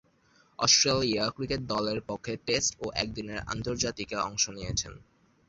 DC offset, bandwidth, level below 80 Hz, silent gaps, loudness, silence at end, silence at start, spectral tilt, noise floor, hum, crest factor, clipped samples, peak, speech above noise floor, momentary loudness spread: under 0.1%; 8 kHz; -52 dBFS; none; -28 LUFS; 0.5 s; 0.6 s; -2.5 dB/octave; -64 dBFS; none; 24 dB; under 0.1%; -6 dBFS; 34 dB; 13 LU